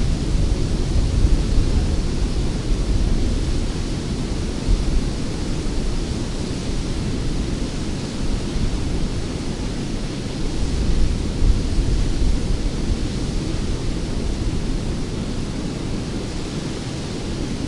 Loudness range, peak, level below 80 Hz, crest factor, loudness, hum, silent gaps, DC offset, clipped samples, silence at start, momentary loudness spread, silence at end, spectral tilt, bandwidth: 3 LU; -4 dBFS; -22 dBFS; 16 dB; -24 LUFS; none; none; under 0.1%; under 0.1%; 0 s; 5 LU; 0 s; -6 dB/octave; 11.5 kHz